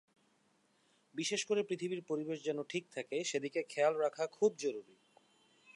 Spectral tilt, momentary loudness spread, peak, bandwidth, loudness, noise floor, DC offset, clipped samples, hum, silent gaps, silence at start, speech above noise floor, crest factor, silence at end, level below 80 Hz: -3.5 dB/octave; 8 LU; -20 dBFS; 11.5 kHz; -37 LUFS; -74 dBFS; under 0.1%; under 0.1%; none; none; 1.15 s; 37 dB; 20 dB; 0.95 s; under -90 dBFS